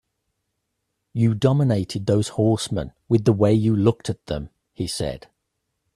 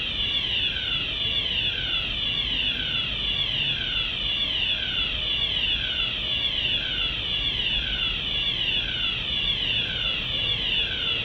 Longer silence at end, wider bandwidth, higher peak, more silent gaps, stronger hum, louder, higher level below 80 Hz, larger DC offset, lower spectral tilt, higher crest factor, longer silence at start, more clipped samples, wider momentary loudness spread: first, 0.8 s vs 0 s; second, 13 kHz vs over 20 kHz; first, -4 dBFS vs -12 dBFS; neither; neither; about the same, -22 LUFS vs -23 LUFS; second, -48 dBFS vs -40 dBFS; neither; first, -7 dB/octave vs -3.5 dB/octave; about the same, 18 dB vs 14 dB; first, 1.15 s vs 0 s; neither; first, 13 LU vs 2 LU